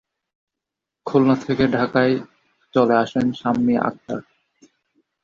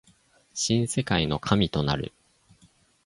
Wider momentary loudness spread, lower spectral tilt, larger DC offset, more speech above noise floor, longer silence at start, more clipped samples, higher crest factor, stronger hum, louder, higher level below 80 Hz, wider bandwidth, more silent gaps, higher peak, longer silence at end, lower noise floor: first, 13 LU vs 9 LU; first, -7.5 dB/octave vs -4.5 dB/octave; neither; first, 66 dB vs 36 dB; first, 1.05 s vs 0.55 s; neither; second, 18 dB vs 24 dB; neither; first, -20 LUFS vs -26 LUFS; second, -56 dBFS vs -46 dBFS; second, 7.4 kHz vs 11.5 kHz; neither; about the same, -4 dBFS vs -4 dBFS; about the same, 1 s vs 0.95 s; first, -85 dBFS vs -61 dBFS